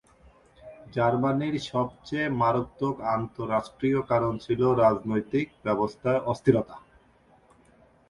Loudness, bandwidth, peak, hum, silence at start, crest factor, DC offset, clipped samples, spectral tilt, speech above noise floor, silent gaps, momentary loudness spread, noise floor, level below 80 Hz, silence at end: -26 LUFS; 11 kHz; -8 dBFS; none; 0.65 s; 20 dB; under 0.1%; under 0.1%; -7.5 dB/octave; 34 dB; none; 7 LU; -60 dBFS; -56 dBFS; 1.3 s